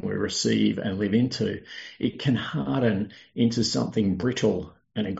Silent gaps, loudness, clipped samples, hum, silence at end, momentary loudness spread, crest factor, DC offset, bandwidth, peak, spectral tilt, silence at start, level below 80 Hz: none; -26 LUFS; under 0.1%; none; 0 s; 9 LU; 16 dB; under 0.1%; 8 kHz; -10 dBFS; -5.5 dB/octave; 0 s; -58 dBFS